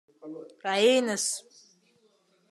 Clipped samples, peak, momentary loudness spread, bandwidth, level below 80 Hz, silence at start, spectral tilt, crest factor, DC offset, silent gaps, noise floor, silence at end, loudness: under 0.1%; -10 dBFS; 21 LU; 13 kHz; under -90 dBFS; 0.25 s; -2 dB/octave; 20 dB; under 0.1%; none; -67 dBFS; 1.1 s; -26 LUFS